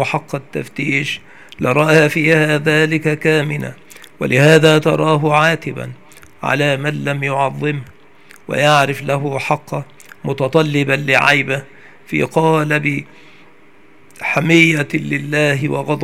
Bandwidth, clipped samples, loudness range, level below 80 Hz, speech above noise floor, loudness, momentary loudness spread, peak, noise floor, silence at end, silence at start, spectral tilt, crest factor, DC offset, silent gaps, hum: 15.5 kHz; under 0.1%; 4 LU; -56 dBFS; 33 dB; -15 LUFS; 14 LU; 0 dBFS; -48 dBFS; 0 s; 0 s; -5.5 dB/octave; 16 dB; 0.6%; none; none